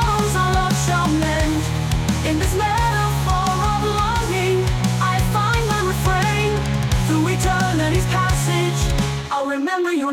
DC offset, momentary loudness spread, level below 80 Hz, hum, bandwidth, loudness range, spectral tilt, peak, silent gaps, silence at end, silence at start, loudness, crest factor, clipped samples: under 0.1%; 3 LU; -28 dBFS; none; 17.5 kHz; 1 LU; -5 dB/octave; -8 dBFS; none; 0 s; 0 s; -19 LUFS; 10 dB; under 0.1%